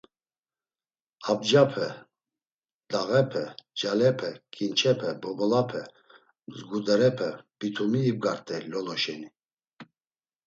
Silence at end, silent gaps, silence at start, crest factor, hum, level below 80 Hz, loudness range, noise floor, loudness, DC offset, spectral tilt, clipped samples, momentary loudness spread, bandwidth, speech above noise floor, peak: 0.65 s; 2.54-2.62 s, 2.73-2.80 s, 9.53-9.57 s; 1.2 s; 22 dB; none; -72 dBFS; 2 LU; under -90 dBFS; -27 LUFS; under 0.1%; -5.5 dB/octave; under 0.1%; 14 LU; 8 kHz; over 64 dB; -6 dBFS